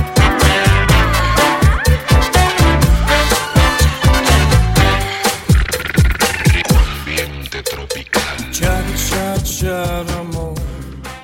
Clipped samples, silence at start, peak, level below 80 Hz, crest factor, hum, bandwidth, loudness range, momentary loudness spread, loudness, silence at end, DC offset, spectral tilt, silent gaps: under 0.1%; 0 s; 0 dBFS; -18 dBFS; 14 dB; none; 16.5 kHz; 7 LU; 11 LU; -14 LUFS; 0 s; under 0.1%; -4.5 dB/octave; none